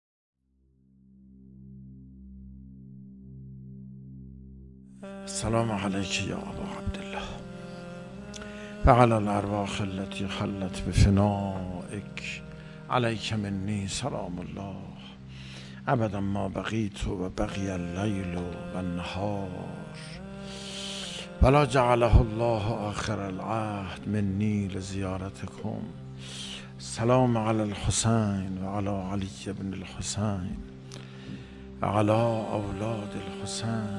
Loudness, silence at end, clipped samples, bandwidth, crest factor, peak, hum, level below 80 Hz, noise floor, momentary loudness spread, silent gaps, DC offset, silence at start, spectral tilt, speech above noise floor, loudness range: -29 LUFS; 0 s; under 0.1%; 11.5 kHz; 26 dB; -4 dBFS; none; -40 dBFS; -67 dBFS; 22 LU; none; under 0.1%; 1.4 s; -6 dB/octave; 39 dB; 9 LU